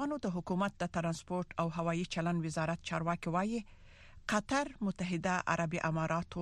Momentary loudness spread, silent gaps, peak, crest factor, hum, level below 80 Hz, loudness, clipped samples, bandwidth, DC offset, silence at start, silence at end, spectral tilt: 5 LU; none; -16 dBFS; 20 dB; none; -58 dBFS; -36 LUFS; under 0.1%; 11.5 kHz; under 0.1%; 0 s; 0 s; -5.5 dB/octave